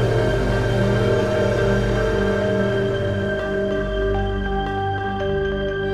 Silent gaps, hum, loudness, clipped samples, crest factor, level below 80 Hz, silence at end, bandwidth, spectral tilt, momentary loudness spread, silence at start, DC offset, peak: none; 50 Hz at -35 dBFS; -21 LUFS; under 0.1%; 14 dB; -30 dBFS; 0 s; 12 kHz; -7 dB/octave; 5 LU; 0 s; under 0.1%; -6 dBFS